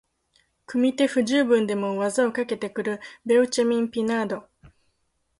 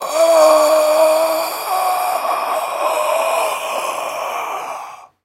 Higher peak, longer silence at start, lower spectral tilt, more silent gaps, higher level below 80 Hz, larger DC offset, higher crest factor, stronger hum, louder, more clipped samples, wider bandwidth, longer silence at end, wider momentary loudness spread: second, -8 dBFS vs 0 dBFS; first, 0.7 s vs 0 s; first, -4.5 dB/octave vs -0.5 dB/octave; neither; first, -66 dBFS vs -78 dBFS; neither; about the same, 16 dB vs 16 dB; neither; second, -24 LUFS vs -16 LUFS; neither; second, 11.5 kHz vs 16 kHz; first, 0.7 s vs 0.2 s; second, 10 LU vs 13 LU